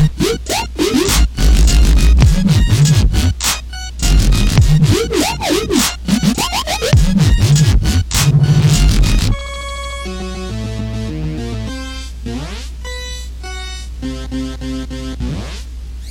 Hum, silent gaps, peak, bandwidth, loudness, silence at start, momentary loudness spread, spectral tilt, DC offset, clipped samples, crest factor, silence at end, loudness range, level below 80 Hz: none; none; 0 dBFS; 17.5 kHz; -15 LUFS; 0 s; 15 LU; -5 dB/octave; under 0.1%; under 0.1%; 14 dB; 0 s; 12 LU; -16 dBFS